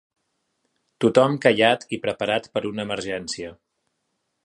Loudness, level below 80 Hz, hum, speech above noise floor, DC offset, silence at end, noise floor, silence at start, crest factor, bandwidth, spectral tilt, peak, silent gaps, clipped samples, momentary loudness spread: -22 LUFS; -62 dBFS; none; 54 dB; under 0.1%; 0.9 s; -75 dBFS; 1 s; 22 dB; 11.5 kHz; -5 dB/octave; -2 dBFS; none; under 0.1%; 12 LU